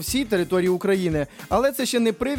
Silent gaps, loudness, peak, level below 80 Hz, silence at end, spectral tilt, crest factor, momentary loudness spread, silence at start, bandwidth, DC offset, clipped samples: none; -22 LUFS; -8 dBFS; -44 dBFS; 0 s; -5 dB/octave; 14 dB; 4 LU; 0 s; 17 kHz; under 0.1%; under 0.1%